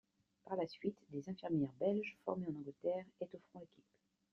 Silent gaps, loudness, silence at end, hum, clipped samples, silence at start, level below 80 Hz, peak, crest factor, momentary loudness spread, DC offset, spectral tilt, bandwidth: none; -43 LUFS; 0.65 s; none; under 0.1%; 0.45 s; -82 dBFS; -24 dBFS; 20 dB; 15 LU; under 0.1%; -7 dB/octave; 7.2 kHz